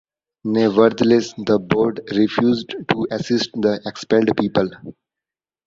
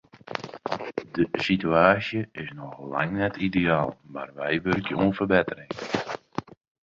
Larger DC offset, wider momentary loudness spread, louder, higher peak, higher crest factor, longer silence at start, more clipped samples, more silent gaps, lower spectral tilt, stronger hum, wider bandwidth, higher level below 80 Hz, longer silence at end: neither; second, 8 LU vs 16 LU; first, -19 LUFS vs -26 LUFS; about the same, -2 dBFS vs -4 dBFS; about the same, 18 dB vs 22 dB; first, 0.45 s vs 0.25 s; neither; neither; about the same, -6 dB/octave vs -7 dB/octave; neither; about the same, 7.8 kHz vs 7.6 kHz; about the same, -54 dBFS vs -54 dBFS; first, 0.75 s vs 0.4 s